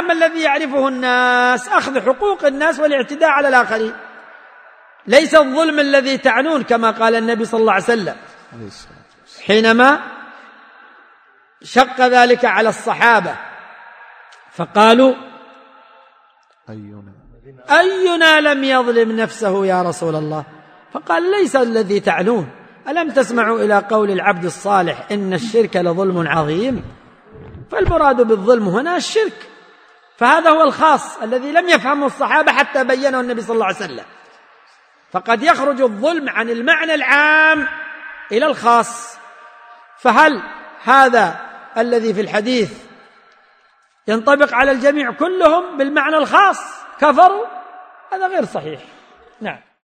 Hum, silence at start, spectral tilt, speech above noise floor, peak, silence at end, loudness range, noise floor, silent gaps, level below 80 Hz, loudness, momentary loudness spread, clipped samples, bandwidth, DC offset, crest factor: none; 0 s; -4.5 dB/octave; 41 dB; 0 dBFS; 0.25 s; 4 LU; -55 dBFS; none; -46 dBFS; -14 LUFS; 16 LU; under 0.1%; 14.5 kHz; under 0.1%; 16 dB